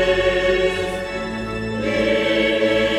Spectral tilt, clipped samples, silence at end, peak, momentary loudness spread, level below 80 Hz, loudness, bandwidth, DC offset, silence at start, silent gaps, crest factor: -5 dB/octave; under 0.1%; 0 s; -6 dBFS; 8 LU; -38 dBFS; -20 LUFS; 13 kHz; under 0.1%; 0 s; none; 12 dB